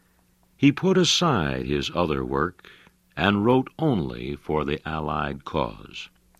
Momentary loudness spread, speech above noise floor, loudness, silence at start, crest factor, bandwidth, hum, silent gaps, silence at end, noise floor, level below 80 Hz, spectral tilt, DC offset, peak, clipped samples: 12 LU; 39 dB; -24 LUFS; 0.6 s; 20 dB; 13.5 kHz; none; none; 0.35 s; -62 dBFS; -44 dBFS; -5 dB/octave; under 0.1%; -6 dBFS; under 0.1%